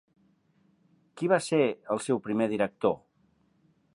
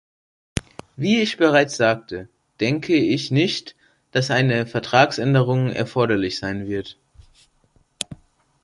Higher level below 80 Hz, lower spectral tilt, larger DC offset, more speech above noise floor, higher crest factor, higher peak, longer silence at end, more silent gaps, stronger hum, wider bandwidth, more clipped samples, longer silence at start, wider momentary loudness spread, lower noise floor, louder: second, -72 dBFS vs -50 dBFS; about the same, -5.5 dB/octave vs -5.5 dB/octave; neither; about the same, 41 dB vs 41 dB; about the same, 22 dB vs 20 dB; second, -8 dBFS vs -2 dBFS; first, 1 s vs 0.5 s; neither; neither; about the same, 11.5 kHz vs 11.5 kHz; neither; first, 1.15 s vs 0.55 s; second, 7 LU vs 15 LU; first, -68 dBFS vs -61 dBFS; second, -28 LUFS vs -20 LUFS